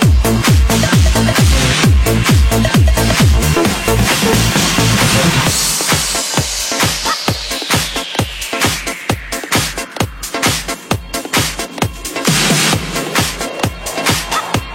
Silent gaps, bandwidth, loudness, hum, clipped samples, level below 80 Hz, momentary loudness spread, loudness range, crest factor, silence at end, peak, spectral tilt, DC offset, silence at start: none; 16.5 kHz; -13 LUFS; none; under 0.1%; -20 dBFS; 8 LU; 6 LU; 14 dB; 0 s; 0 dBFS; -3.5 dB/octave; under 0.1%; 0 s